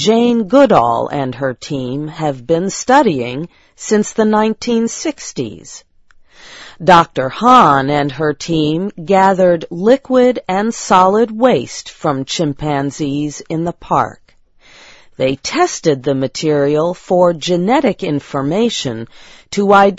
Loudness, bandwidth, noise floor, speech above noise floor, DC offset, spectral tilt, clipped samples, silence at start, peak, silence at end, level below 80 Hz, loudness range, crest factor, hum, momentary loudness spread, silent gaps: -14 LUFS; 8 kHz; -47 dBFS; 34 dB; under 0.1%; -5 dB/octave; 0.2%; 0 s; 0 dBFS; 0 s; -48 dBFS; 6 LU; 14 dB; none; 12 LU; none